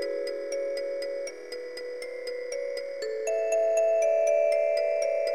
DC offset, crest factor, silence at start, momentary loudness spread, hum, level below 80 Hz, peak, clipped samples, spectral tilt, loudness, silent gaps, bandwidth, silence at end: 0.2%; 14 dB; 0 s; 13 LU; none; -78 dBFS; -14 dBFS; under 0.1%; -0.5 dB/octave; -28 LUFS; none; 12.5 kHz; 0 s